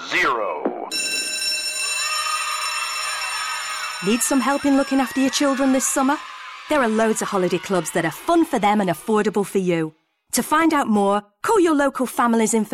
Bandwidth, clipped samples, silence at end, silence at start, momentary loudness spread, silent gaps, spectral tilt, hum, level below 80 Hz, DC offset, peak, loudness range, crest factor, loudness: 18 kHz; under 0.1%; 0 s; 0 s; 6 LU; none; -3.5 dB/octave; none; -56 dBFS; under 0.1%; -8 dBFS; 2 LU; 12 dB; -20 LUFS